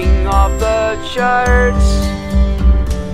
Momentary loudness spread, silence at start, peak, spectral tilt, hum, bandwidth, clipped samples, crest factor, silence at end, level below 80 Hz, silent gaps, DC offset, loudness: 5 LU; 0 s; 0 dBFS; -6 dB/octave; none; 12 kHz; under 0.1%; 12 dB; 0 s; -14 dBFS; none; under 0.1%; -14 LUFS